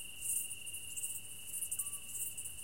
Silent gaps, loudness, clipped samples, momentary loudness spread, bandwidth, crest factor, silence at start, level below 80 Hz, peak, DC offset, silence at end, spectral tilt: none; -39 LUFS; under 0.1%; 6 LU; 17 kHz; 20 dB; 0 s; -68 dBFS; -24 dBFS; 0.3%; 0 s; 1 dB/octave